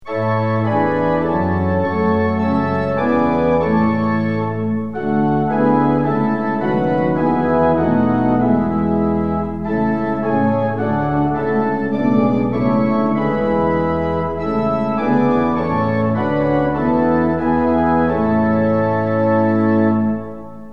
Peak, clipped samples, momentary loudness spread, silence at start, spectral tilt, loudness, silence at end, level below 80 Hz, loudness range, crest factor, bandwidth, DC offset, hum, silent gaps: -2 dBFS; under 0.1%; 4 LU; 0 s; -10 dB/octave; -17 LUFS; 0 s; -40 dBFS; 1 LU; 14 dB; 5.6 kHz; 1%; none; none